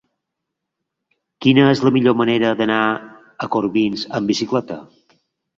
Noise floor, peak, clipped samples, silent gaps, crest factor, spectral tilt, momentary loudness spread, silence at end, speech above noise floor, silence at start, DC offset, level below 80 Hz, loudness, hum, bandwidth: -80 dBFS; -2 dBFS; under 0.1%; none; 18 dB; -6 dB/octave; 12 LU; 0.75 s; 63 dB; 1.4 s; under 0.1%; -58 dBFS; -17 LUFS; none; 7.6 kHz